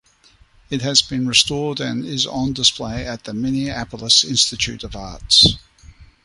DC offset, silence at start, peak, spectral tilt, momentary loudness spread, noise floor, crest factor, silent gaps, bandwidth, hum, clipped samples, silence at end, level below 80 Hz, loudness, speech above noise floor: under 0.1%; 0.7 s; 0 dBFS; -2.5 dB/octave; 16 LU; -53 dBFS; 20 dB; none; 11.5 kHz; none; under 0.1%; 0.2 s; -40 dBFS; -17 LUFS; 34 dB